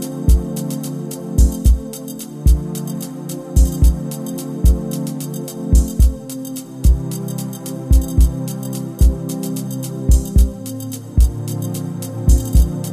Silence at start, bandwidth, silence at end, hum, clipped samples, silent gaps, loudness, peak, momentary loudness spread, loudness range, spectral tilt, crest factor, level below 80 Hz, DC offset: 0 s; 15 kHz; 0 s; none; under 0.1%; none; -19 LUFS; 0 dBFS; 12 LU; 1 LU; -6.5 dB/octave; 16 dB; -18 dBFS; under 0.1%